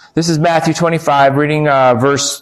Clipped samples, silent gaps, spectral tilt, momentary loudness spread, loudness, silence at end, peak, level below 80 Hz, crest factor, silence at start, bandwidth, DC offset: under 0.1%; none; -5 dB/octave; 3 LU; -12 LUFS; 0.05 s; -2 dBFS; -48 dBFS; 10 dB; 0.15 s; 14 kHz; under 0.1%